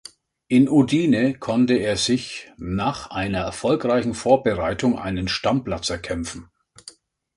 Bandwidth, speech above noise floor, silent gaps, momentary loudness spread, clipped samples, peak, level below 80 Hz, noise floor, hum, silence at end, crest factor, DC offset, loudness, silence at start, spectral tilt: 11.5 kHz; 27 dB; none; 11 LU; under 0.1%; -2 dBFS; -44 dBFS; -48 dBFS; none; 0.45 s; 20 dB; under 0.1%; -21 LUFS; 0.5 s; -5.5 dB/octave